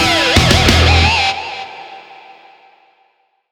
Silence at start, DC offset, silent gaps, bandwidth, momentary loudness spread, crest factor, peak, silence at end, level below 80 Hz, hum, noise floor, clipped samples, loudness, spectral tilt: 0 s; under 0.1%; none; 19 kHz; 21 LU; 14 dB; 0 dBFS; 1.4 s; -24 dBFS; none; -59 dBFS; under 0.1%; -11 LUFS; -4 dB/octave